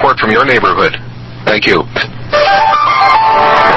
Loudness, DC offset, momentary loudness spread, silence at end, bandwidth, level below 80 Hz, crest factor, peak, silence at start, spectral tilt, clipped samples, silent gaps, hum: -9 LUFS; under 0.1%; 10 LU; 0 s; 8 kHz; -38 dBFS; 10 dB; 0 dBFS; 0 s; -5 dB/octave; 0.4%; none; none